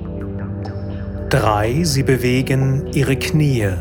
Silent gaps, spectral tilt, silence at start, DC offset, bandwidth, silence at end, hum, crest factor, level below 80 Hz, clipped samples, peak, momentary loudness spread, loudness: none; -6 dB/octave; 0 s; under 0.1%; 18 kHz; 0 s; 50 Hz at -40 dBFS; 18 dB; -34 dBFS; under 0.1%; 0 dBFS; 11 LU; -18 LUFS